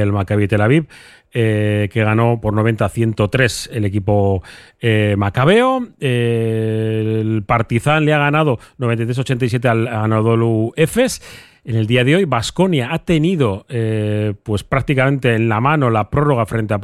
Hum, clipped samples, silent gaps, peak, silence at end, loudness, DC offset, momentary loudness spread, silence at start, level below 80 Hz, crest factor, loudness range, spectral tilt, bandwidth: none; under 0.1%; none; 0 dBFS; 0 s; -16 LUFS; under 0.1%; 6 LU; 0 s; -42 dBFS; 16 dB; 1 LU; -6.5 dB/octave; 13 kHz